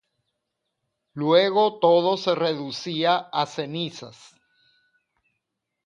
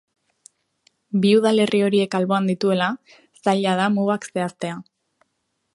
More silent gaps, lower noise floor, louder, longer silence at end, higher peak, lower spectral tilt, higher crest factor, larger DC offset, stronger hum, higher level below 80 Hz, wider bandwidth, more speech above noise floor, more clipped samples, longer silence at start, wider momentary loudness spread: neither; first, -81 dBFS vs -74 dBFS; about the same, -22 LUFS vs -20 LUFS; first, 1.75 s vs 0.9 s; about the same, -6 dBFS vs -4 dBFS; about the same, -5.5 dB/octave vs -6 dB/octave; about the same, 20 dB vs 18 dB; neither; neither; about the same, -74 dBFS vs -70 dBFS; second, 7.6 kHz vs 11.5 kHz; first, 59 dB vs 54 dB; neither; about the same, 1.15 s vs 1.15 s; about the same, 13 LU vs 11 LU